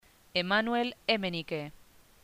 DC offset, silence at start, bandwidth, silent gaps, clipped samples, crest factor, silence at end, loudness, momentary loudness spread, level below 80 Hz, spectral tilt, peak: under 0.1%; 0.35 s; 15.5 kHz; none; under 0.1%; 20 dB; 0.55 s; -31 LUFS; 10 LU; -64 dBFS; -5.5 dB/octave; -12 dBFS